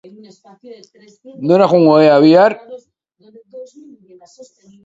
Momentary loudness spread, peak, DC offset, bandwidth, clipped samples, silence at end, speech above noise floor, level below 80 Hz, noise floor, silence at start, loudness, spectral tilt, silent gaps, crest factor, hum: 12 LU; 0 dBFS; under 0.1%; 7.8 kHz; under 0.1%; 1.2 s; 38 dB; -64 dBFS; -51 dBFS; 0.7 s; -10 LUFS; -7.5 dB/octave; none; 16 dB; none